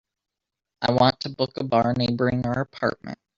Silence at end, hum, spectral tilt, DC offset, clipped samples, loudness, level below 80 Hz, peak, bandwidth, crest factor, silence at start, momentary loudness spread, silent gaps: 0.25 s; none; -7 dB/octave; under 0.1%; under 0.1%; -23 LUFS; -54 dBFS; -4 dBFS; 7.4 kHz; 20 dB; 0.8 s; 8 LU; none